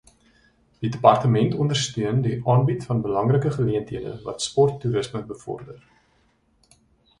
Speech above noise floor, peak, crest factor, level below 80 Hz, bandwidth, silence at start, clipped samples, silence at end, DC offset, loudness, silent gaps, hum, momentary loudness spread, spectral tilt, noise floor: 42 dB; 0 dBFS; 22 dB; -54 dBFS; 11 kHz; 0.8 s; under 0.1%; 1.45 s; under 0.1%; -22 LUFS; none; none; 14 LU; -6.5 dB/octave; -63 dBFS